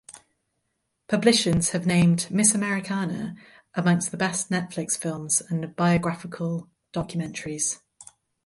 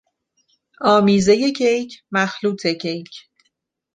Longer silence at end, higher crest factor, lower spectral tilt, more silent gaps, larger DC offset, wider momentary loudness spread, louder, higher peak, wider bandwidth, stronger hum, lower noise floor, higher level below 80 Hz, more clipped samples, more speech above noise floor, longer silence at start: second, 0.45 s vs 0.75 s; about the same, 22 dB vs 18 dB; about the same, -4 dB/octave vs -5 dB/octave; neither; neither; about the same, 12 LU vs 12 LU; second, -24 LUFS vs -18 LUFS; about the same, -4 dBFS vs -2 dBFS; first, 12 kHz vs 9.4 kHz; neither; first, -77 dBFS vs -71 dBFS; about the same, -54 dBFS vs -56 dBFS; neither; about the same, 52 dB vs 53 dB; second, 0.1 s vs 0.8 s